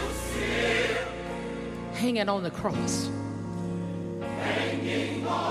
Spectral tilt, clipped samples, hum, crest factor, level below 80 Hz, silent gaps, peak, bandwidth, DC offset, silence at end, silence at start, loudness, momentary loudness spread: -4.5 dB/octave; under 0.1%; none; 16 dB; -46 dBFS; none; -14 dBFS; 15.5 kHz; under 0.1%; 0 s; 0 s; -30 LUFS; 9 LU